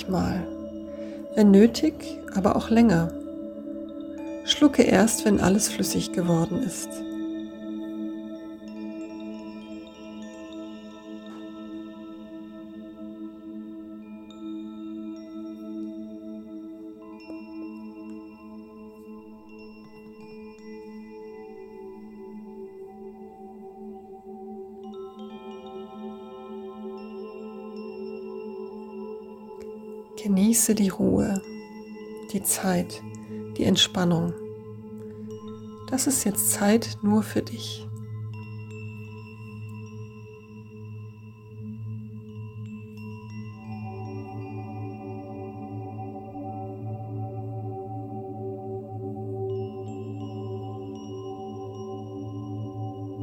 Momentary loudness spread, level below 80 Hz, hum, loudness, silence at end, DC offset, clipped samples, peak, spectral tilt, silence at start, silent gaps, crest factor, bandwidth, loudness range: 21 LU; -56 dBFS; none; -27 LUFS; 0 s; under 0.1%; under 0.1%; -4 dBFS; -4.5 dB/octave; 0 s; none; 24 dB; over 20 kHz; 19 LU